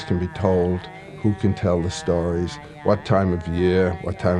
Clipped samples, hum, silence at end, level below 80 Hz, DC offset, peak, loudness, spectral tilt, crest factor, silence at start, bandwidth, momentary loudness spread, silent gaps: under 0.1%; none; 0 s; -42 dBFS; under 0.1%; -4 dBFS; -22 LUFS; -7.5 dB/octave; 18 dB; 0 s; 10.5 kHz; 7 LU; none